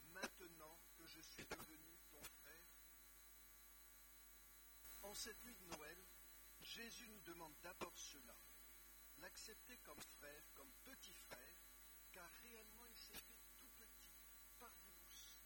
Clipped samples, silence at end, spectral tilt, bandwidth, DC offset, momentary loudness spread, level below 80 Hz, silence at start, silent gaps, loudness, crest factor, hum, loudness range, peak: under 0.1%; 0 s; -1.5 dB/octave; 17.5 kHz; under 0.1%; 9 LU; -74 dBFS; 0 s; none; -59 LUFS; 28 dB; none; 4 LU; -32 dBFS